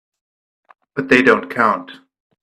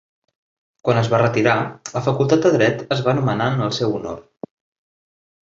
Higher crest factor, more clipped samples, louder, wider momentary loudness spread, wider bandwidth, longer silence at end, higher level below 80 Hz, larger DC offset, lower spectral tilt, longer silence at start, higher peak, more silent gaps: about the same, 18 dB vs 18 dB; neither; first, -15 LUFS vs -19 LUFS; about the same, 15 LU vs 16 LU; first, 12.5 kHz vs 7.6 kHz; second, 0.45 s vs 1.35 s; about the same, -58 dBFS vs -54 dBFS; neither; about the same, -5.5 dB/octave vs -6 dB/octave; about the same, 0.95 s vs 0.85 s; about the same, 0 dBFS vs -2 dBFS; neither